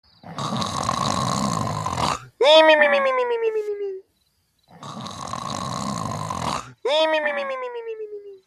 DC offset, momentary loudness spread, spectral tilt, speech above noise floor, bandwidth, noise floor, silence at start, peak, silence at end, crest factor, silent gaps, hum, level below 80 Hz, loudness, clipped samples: under 0.1%; 19 LU; -4 dB/octave; 48 dB; 13.5 kHz; -67 dBFS; 0.25 s; -2 dBFS; 0.1 s; 20 dB; none; none; -52 dBFS; -21 LUFS; under 0.1%